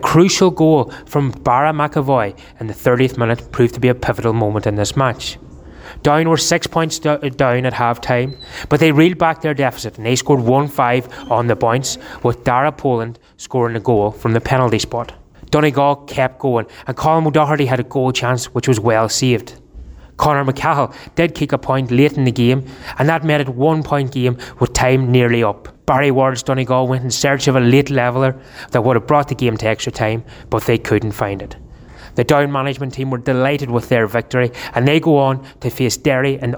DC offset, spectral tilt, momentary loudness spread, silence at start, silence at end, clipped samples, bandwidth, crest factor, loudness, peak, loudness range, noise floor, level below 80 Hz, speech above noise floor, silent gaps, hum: under 0.1%; -5.5 dB/octave; 8 LU; 0 s; 0 s; under 0.1%; over 20 kHz; 14 dB; -16 LUFS; -2 dBFS; 3 LU; -37 dBFS; -40 dBFS; 22 dB; none; none